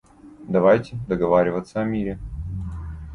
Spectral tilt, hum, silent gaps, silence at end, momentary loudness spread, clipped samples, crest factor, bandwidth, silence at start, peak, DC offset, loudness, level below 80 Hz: -8.5 dB/octave; none; none; 0 s; 15 LU; under 0.1%; 18 dB; 10.5 kHz; 0.25 s; -4 dBFS; under 0.1%; -22 LUFS; -38 dBFS